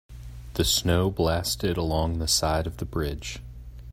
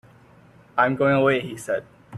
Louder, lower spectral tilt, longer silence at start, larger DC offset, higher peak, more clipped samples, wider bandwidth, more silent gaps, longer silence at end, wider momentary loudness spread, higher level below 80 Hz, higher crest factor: second, -25 LUFS vs -22 LUFS; second, -4 dB/octave vs -6 dB/octave; second, 0.1 s vs 0.75 s; neither; second, -10 dBFS vs -4 dBFS; neither; first, 16 kHz vs 13.5 kHz; neither; about the same, 0 s vs 0 s; first, 19 LU vs 10 LU; first, -38 dBFS vs -60 dBFS; about the same, 18 dB vs 20 dB